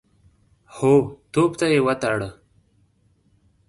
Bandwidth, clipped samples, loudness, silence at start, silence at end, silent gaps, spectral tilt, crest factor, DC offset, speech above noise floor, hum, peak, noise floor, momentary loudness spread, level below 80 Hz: 11.5 kHz; under 0.1%; -20 LUFS; 0.75 s; 1.35 s; none; -6 dB/octave; 18 dB; under 0.1%; 43 dB; none; -6 dBFS; -62 dBFS; 8 LU; -54 dBFS